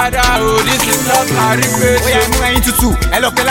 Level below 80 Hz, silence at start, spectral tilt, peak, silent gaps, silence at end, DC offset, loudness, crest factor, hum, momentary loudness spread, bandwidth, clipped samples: -22 dBFS; 0 s; -3 dB/octave; 0 dBFS; none; 0 s; under 0.1%; -11 LUFS; 12 dB; none; 2 LU; 17.5 kHz; under 0.1%